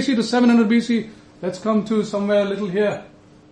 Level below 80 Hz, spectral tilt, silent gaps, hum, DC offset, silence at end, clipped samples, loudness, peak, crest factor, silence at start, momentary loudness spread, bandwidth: -60 dBFS; -6 dB/octave; none; none; under 0.1%; 0.45 s; under 0.1%; -20 LUFS; -6 dBFS; 14 dB; 0 s; 14 LU; 9.8 kHz